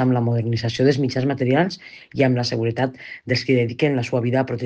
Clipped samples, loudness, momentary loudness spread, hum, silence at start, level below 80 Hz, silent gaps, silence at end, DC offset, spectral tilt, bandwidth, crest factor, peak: under 0.1%; -21 LUFS; 6 LU; none; 0 s; -58 dBFS; none; 0 s; under 0.1%; -7 dB/octave; 8 kHz; 16 dB; -4 dBFS